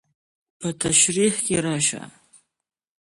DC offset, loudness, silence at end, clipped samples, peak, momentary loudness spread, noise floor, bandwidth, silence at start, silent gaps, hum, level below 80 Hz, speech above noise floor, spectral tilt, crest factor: under 0.1%; -20 LUFS; 1 s; under 0.1%; -6 dBFS; 15 LU; -81 dBFS; 12 kHz; 0.6 s; none; none; -56 dBFS; 60 dB; -3 dB/octave; 20 dB